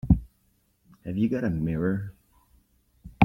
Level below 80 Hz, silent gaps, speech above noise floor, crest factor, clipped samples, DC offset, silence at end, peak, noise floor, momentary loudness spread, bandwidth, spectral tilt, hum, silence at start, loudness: -38 dBFS; none; 41 dB; 24 dB; under 0.1%; under 0.1%; 0 s; -2 dBFS; -68 dBFS; 13 LU; 6.2 kHz; -9.5 dB/octave; none; 0.05 s; -28 LUFS